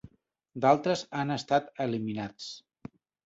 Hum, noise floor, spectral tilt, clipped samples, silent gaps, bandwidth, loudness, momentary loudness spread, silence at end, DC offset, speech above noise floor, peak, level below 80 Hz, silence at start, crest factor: none; -64 dBFS; -5.5 dB/octave; under 0.1%; none; 8 kHz; -29 LUFS; 23 LU; 0.65 s; under 0.1%; 35 dB; -10 dBFS; -68 dBFS; 0.05 s; 22 dB